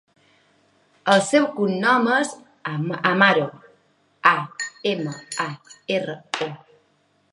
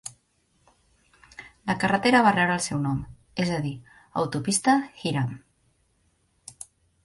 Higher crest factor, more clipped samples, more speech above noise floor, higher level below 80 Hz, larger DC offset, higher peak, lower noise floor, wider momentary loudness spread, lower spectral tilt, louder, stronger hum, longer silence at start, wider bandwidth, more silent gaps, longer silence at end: about the same, 22 dB vs 20 dB; neither; about the same, 43 dB vs 44 dB; second, -74 dBFS vs -56 dBFS; neither; first, 0 dBFS vs -6 dBFS; second, -64 dBFS vs -68 dBFS; second, 13 LU vs 25 LU; about the same, -4.5 dB/octave vs -4.5 dB/octave; first, -21 LUFS vs -25 LUFS; neither; first, 1.05 s vs 0.05 s; about the same, 11.5 kHz vs 11.5 kHz; neither; second, 0.75 s vs 1.65 s